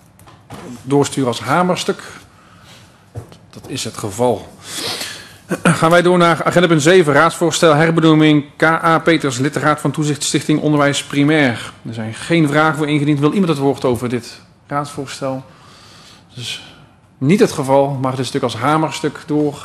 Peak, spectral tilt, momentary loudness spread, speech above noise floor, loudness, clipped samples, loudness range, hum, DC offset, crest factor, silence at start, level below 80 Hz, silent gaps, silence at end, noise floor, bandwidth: 0 dBFS; -5 dB/octave; 15 LU; 30 dB; -15 LUFS; under 0.1%; 11 LU; none; under 0.1%; 16 dB; 0.5 s; -52 dBFS; none; 0 s; -45 dBFS; 13.5 kHz